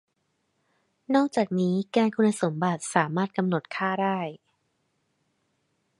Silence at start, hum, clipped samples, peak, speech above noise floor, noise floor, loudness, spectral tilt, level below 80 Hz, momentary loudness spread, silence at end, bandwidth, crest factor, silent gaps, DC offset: 1.1 s; none; under 0.1%; -4 dBFS; 50 dB; -75 dBFS; -26 LUFS; -6 dB/octave; -74 dBFS; 5 LU; 1.65 s; 11.5 kHz; 22 dB; none; under 0.1%